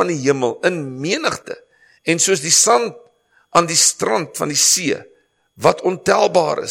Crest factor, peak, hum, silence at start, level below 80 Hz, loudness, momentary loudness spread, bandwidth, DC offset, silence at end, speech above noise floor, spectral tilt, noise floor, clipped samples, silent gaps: 18 dB; 0 dBFS; none; 0 s; -60 dBFS; -16 LUFS; 13 LU; 16.5 kHz; under 0.1%; 0 s; 32 dB; -2 dB/octave; -49 dBFS; under 0.1%; none